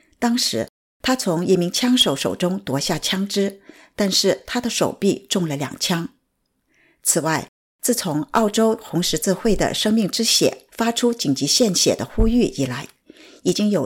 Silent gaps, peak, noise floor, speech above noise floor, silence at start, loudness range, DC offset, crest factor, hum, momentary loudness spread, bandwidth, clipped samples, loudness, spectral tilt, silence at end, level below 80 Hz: 0.69-1.00 s, 7.48-7.79 s; -6 dBFS; -71 dBFS; 51 dB; 0.2 s; 4 LU; under 0.1%; 16 dB; none; 9 LU; 17 kHz; under 0.1%; -20 LUFS; -3.5 dB/octave; 0 s; -36 dBFS